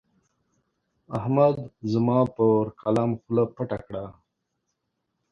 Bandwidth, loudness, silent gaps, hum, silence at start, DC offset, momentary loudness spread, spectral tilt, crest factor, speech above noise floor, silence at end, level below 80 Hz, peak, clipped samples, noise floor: 9.2 kHz; -24 LUFS; none; none; 1.1 s; under 0.1%; 13 LU; -9.5 dB/octave; 20 dB; 55 dB; 1.2 s; -58 dBFS; -6 dBFS; under 0.1%; -79 dBFS